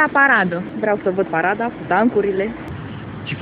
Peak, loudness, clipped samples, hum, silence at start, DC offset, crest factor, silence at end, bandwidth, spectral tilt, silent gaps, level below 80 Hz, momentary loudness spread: 0 dBFS; -18 LUFS; under 0.1%; none; 0 s; under 0.1%; 18 dB; 0 s; 4.8 kHz; -9 dB/octave; none; -50 dBFS; 17 LU